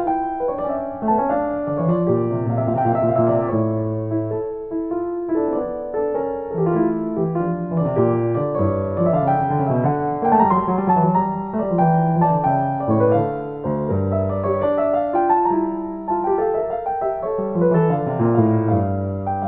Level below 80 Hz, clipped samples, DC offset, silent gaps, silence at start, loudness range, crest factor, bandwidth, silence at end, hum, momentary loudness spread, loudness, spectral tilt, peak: -50 dBFS; under 0.1%; under 0.1%; none; 0 s; 4 LU; 18 dB; 3.7 kHz; 0 s; none; 7 LU; -20 LUFS; -14 dB/octave; -2 dBFS